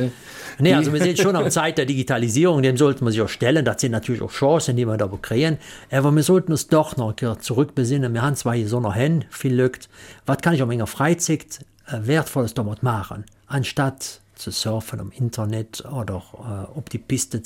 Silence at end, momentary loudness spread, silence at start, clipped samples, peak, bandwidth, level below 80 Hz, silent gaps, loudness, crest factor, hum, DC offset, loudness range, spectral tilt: 0 s; 14 LU; 0 s; under 0.1%; -4 dBFS; 17 kHz; -52 dBFS; none; -21 LUFS; 16 dB; none; under 0.1%; 7 LU; -5.5 dB/octave